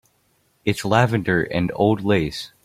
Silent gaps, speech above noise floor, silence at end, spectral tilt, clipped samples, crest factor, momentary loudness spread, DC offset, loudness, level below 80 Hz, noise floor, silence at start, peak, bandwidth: none; 44 dB; 0.15 s; -6.5 dB/octave; under 0.1%; 20 dB; 7 LU; under 0.1%; -21 LUFS; -48 dBFS; -64 dBFS; 0.65 s; -2 dBFS; 16 kHz